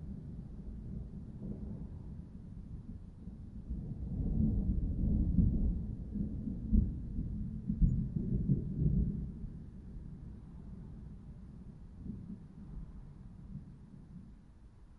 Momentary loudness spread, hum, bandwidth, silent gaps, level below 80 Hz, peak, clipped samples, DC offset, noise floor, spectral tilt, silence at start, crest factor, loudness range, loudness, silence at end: 19 LU; none; 2 kHz; none; -40 dBFS; -16 dBFS; under 0.1%; under 0.1%; -57 dBFS; -12 dB/octave; 0 s; 22 dB; 15 LU; -38 LUFS; 0 s